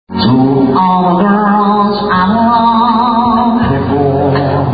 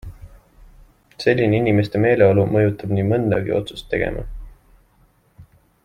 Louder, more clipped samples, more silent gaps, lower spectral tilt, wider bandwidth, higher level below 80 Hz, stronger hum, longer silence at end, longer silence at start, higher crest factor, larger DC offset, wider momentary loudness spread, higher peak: first, -10 LUFS vs -19 LUFS; neither; neither; first, -11 dB/octave vs -8 dB/octave; second, 5 kHz vs 10 kHz; first, -34 dBFS vs -40 dBFS; neither; second, 0 s vs 0.4 s; about the same, 0.1 s vs 0.05 s; second, 10 dB vs 18 dB; first, 0.6% vs under 0.1%; second, 3 LU vs 11 LU; about the same, 0 dBFS vs -2 dBFS